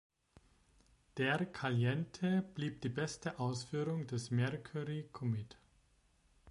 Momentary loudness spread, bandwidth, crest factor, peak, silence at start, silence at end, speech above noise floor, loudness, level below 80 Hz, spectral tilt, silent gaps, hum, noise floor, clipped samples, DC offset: 7 LU; 11.5 kHz; 18 dB; -20 dBFS; 1.15 s; 0 s; 34 dB; -39 LUFS; -70 dBFS; -6 dB/octave; none; none; -72 dBFS; under 0.1%; under 0.1%